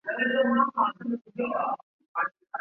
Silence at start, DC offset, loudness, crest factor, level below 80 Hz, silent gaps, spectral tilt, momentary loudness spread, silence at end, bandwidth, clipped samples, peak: 0.05 s; under 0.1%; -28 LUFS; 18 dB; -76 dBFS; 1.83-1.99 s, 2.08-2.15 s; -8 dB/octave; 11 LU; 0 s; 3.4 kHz; under 0.1%; -10 dBFS